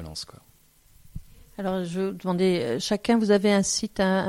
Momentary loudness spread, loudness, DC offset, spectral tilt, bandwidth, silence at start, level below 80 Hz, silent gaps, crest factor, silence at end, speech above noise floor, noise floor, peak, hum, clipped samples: 25 LU; -24 LUFS; under 0.1%; -4.5 dB/octave; 15.5 kHz; 0 s; -52 dBFS; none; 18 dB; 0 s; 34 dB; -58 dBFS; -8 dBFS; none; under 0.1%